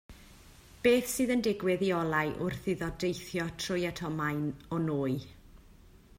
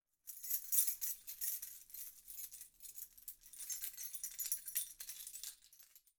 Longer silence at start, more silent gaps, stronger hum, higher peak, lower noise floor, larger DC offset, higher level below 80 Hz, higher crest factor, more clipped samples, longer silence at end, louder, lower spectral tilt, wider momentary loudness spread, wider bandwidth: second, 0.1 s vs 0.25 s; neither; neither; first, -14 dBFS vs -18 dBFS; second, -56 dBFS vs -66 dBFS; neither; first, -56 dBFS vs -80 dBFS; second, 20 dB vs 28 dB; neither; first, 0.45 s vs 0.2 s; first, -31 LUFS vs -41 LUFS; first, -5 dB/octave vs 4 dB/octave; second, 8 LU vs 18 LU; second, 16 kHz vs over 20 kHz